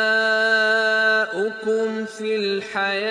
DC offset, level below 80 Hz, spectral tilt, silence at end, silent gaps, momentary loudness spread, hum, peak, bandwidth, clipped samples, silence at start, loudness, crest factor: under 0.1%; -76 dBFS; -3 dB/octave; 0 s; none; 8 LU; none; -8 dBFS; 10.5 kHz; under 0.1%; 0 s; -20 LUFS; 12 dB